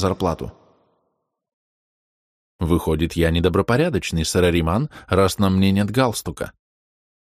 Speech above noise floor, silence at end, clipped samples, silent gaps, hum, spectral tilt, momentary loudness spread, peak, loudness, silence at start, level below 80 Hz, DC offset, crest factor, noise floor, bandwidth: 54 dB; 0.7 s; under 0.1%; 1.53-2.59 s; none; -6 dB/octave; 11 LU; -4 dBFS; -20 LUFS; 0 s; -36 dBFS; under 0.1%; 18 dB; -73 dBFS; 15.5 kHz